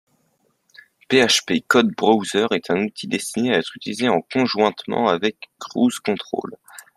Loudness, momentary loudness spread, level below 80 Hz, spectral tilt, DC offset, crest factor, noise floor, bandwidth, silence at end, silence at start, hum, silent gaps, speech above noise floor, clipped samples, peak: -20 LUFS; 10 LU; -64 dBFS; -3.5 dB/octave; under 0.1%; 20 dB; -66 dBFS; 14.5 kHz; 0.15 s; 1.1 s; none; none; 46 dB; under 0.1%; -2 dBFS